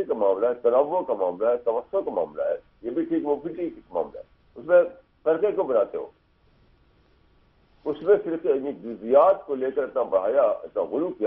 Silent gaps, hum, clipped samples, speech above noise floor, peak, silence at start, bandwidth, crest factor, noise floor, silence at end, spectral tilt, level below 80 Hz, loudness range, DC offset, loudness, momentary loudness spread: none; none; under 0.1%; 37 dB; -6 dBFS; 0 s; 3.7 kHz; 18 dB; -61 dBFS; 0 s; -9.5 dB/octave; -64 dBFS; 5 LU; under 0.1%; -24 LUFS; 12 LU